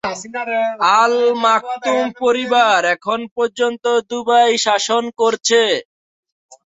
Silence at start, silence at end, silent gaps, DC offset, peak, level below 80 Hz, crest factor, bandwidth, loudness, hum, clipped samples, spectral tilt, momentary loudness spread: 0.05 s; 0.85 s; 3.31-3.36 s; under 0.1%; -2 dBFS; -66 dBFS; 16 dB; 8 kHz; -16 LUFS; none; under 0.1%; -1.5 dB/octave; 8 LU